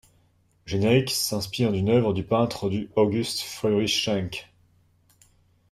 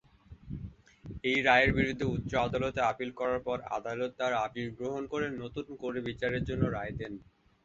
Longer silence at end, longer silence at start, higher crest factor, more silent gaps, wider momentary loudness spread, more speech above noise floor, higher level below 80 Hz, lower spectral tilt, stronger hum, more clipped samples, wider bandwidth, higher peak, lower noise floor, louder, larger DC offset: first, 1.3 s vs 0.4 s; first, 0.65 s vs 0.3 s; about the same, 20 dB vs 24 dB; neither; second, 7 LU vs 18 LU; first, 40 dB vs 22 dB; second, -56 dBFS vs -50 dBFS; about the same, -5 dB/octave vs -6 dB/octave; neither; neither; first, 15 kHz vs 7.8 kHz; first, -6 dBFS vs -10 dBFS; first, -63 dBFS vs -53 dBFS; first, -24 LUFS vs -32 LUFS; neither